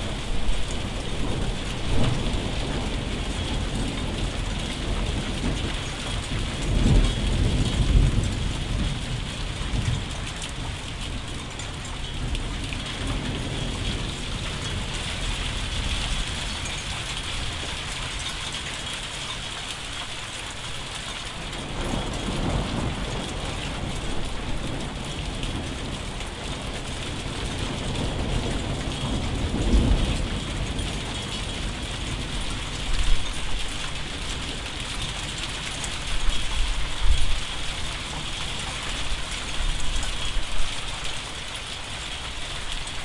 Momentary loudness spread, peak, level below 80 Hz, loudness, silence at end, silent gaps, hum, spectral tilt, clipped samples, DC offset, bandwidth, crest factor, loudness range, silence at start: 6 LU; -6 dBFS; -30 dBFS; -29 LUFS; 0 s; none; none; -4 dB/octave; under 0.1%; under 0.1%; 11.5 kHz; 20 dB; 5 LU; 0 s